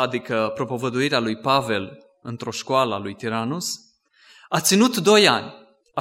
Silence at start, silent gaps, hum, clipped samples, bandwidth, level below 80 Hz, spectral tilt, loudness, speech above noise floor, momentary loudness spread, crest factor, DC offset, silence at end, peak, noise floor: 0 s; none; none; under 0.1%; 16 kHz; -66 dBFS; -3.5 dB/octave; -21 LUFS; 33 dB; 17 LU; 22 dB; under 0.1%; 0 s; 0 dBFS; -54 dBFS